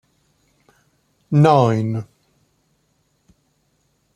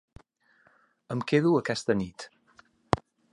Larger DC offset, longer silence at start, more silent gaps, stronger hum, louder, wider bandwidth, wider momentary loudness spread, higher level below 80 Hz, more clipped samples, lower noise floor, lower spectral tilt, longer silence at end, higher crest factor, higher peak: neither; first, 1.3 s vs 1.1 s; neither; neither; first, -17 LUFS vs -28 LUFS; second, 10 kHz vs 11.5 kHz; about the same, 16 LU vs 16 LU; second, -62 dBFS vs -56 dBFS; neither; about the same, -65 dBFS vs -65 dBFS; first, -8.5 dB/octave vs -6 dB/octave; first, 2.15 s vs 0.35 s; second, 20 dB vs 28 dB; about the same, -2 dBFS vs -4 dBFS